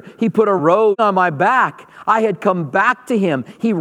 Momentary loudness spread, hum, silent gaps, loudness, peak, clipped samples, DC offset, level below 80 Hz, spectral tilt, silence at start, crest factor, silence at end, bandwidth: 7 LU; none; none; -16 LUFS; 0 dBFS; under 0.1%; under 0.1%; -70 dBFS; -7 dB/octave; 0.05 s; 16 dB; 0 s; 12 kHz